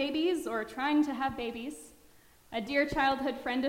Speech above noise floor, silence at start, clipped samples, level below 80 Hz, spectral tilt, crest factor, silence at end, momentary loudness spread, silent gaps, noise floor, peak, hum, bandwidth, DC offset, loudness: 28 dB; 0 s; under 0.1%; -58 dBFS; -4.5 dB/octave; 16 dB; 0 s; 12 LU; none; -60 dBFS; -16 dBFS; none; 16 kHz; under 0.1%; -31 LUFS